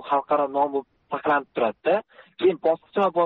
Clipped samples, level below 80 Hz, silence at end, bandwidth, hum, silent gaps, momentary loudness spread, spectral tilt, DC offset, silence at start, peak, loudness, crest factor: under 0.1%; -70 dBFS; 0 s; 4.7 kHz; none; none; 5 LU; -3.5 dB/octave; under 0.1%; 0 s; -10 dBFS; -24 LUFS; 14 dB